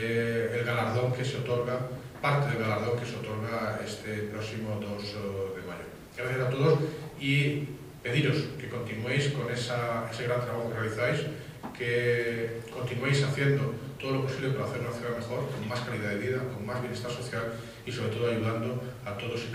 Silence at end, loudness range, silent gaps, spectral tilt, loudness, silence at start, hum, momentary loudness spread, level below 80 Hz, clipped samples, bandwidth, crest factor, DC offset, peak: 0 s; 4 LU; none; -6 dB/octave; -31 LUFS; 0 s; none; 10 LU; -60 dBFS; under 0.1%; 15.5 kHz; 18 dB; under 0.1%; -12 dBFS